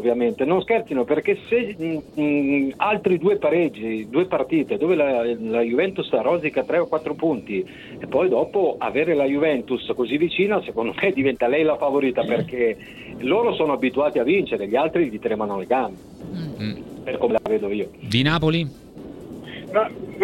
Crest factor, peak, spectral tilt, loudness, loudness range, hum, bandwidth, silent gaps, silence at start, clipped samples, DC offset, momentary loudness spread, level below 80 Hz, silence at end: 18 dB; -4 dBFS; -7 dB/octave; -22 LUFS; 3 LU; none; 12.5 kHz; none; 0 s; under 0.1%; under 0.1%; 11 LU; -52 dBFS; 0 s